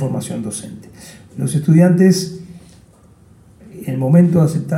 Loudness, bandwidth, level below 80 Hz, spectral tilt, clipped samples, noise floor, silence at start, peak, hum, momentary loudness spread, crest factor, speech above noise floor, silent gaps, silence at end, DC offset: -15 LUFS; 14 kHz; -54 dBFS; -7 dB/octave; under 0.1%; -47 dBFS; 0 s; -2 dBFS; none; 23 LU; 14 dB; 33 dB; none; 0 s; under 0.1%